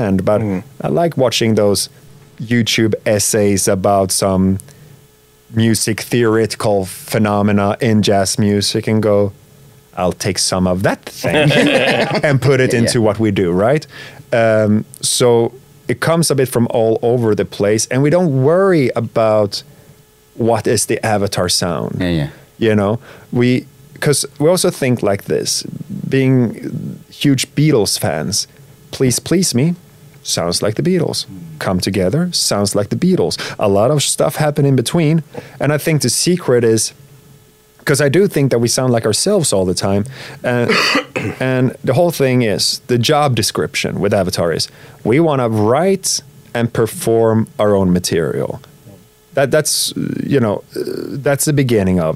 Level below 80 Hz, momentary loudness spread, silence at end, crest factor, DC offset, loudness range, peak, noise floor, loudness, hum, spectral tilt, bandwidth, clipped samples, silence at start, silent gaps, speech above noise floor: -48 dBFS; 8 LU; 0 s; 14 dB; under 0.1%; 3 LU; 0 dBFS; -48 dBFS; -15 LUFS; none; -4.5 dB/octave; 16 kHz; under 0.1%; 0 s; none; 34 dB